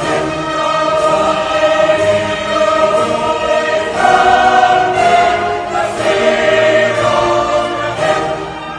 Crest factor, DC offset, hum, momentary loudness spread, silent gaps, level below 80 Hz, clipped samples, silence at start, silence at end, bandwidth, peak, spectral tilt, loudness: 12 dB; under 0.1%; none; 7 LU; none; -42 dBFS; under 0.1%; 0 s; 0 s; 10.5 kHz; 0 dBFS; -4 dB/octave; -12 LUFS